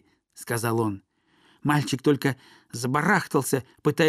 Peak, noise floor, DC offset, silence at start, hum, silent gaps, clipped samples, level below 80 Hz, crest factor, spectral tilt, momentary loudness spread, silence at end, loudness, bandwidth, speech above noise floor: -6 dBFS; -62 dBFS; under 0.1%; 0.35 s; none; none; under 0.1%; -66 dBFS; 18 dB; -5.5 dB/octave; 16 LU; 0 s; -25 LUFS; 15.5 kHz; 37 dB